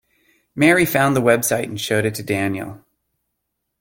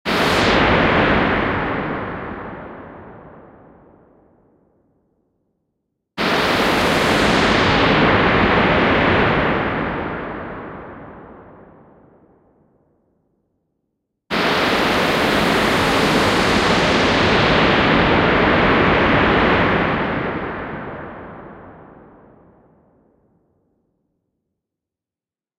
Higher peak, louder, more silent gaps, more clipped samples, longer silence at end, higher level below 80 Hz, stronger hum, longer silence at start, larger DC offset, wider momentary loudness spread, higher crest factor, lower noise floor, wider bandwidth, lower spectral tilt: about the same, 0 dBFS vs -2 dBFS; about the same, -18 LUFS vs -16 LUFS; neither; neither; second, 1.05 s vs 3.75 s; second, -54 dBFS vs -36 dBFS; neither; first, 0.55 s vs 0.05 s; neither; second, 12 LU vs 18 LU; about the same, 20 dB vs 16 dB; second, -76 dBFS vs under -90 dBFS; about the same, 17 kHz vs 16 kHz; about the same, -4.5 dB/octave vs -5 dB/octave